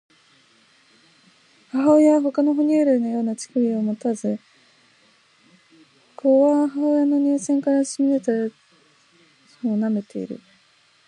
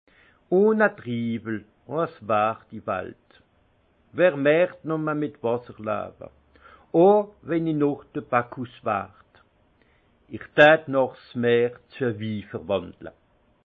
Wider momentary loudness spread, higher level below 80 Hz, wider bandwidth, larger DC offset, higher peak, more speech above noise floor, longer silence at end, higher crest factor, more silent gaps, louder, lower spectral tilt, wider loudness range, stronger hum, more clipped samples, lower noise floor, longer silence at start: second, 13 LU vs 17 LU; second, -74 dBFS vs -64 dBFS; first, 11 kHz vs 7 kHz; neither; about the same, -6 dBFS vs -4 dBFS; about the same, 39 dB vs 40 dB; first, 0.7 s vs 0.55 s; second, 16 dB vs 22 dB; neither; first, -20 LUFS vs -24 LUFS; second, -6.5 dB/octave vs -8.5 dB/octave; about the same, 5 LU vs 5 LU; neither; neither; second, -58 dBFS vs -63 dBFS; first, 1.75 s vs 0.5 s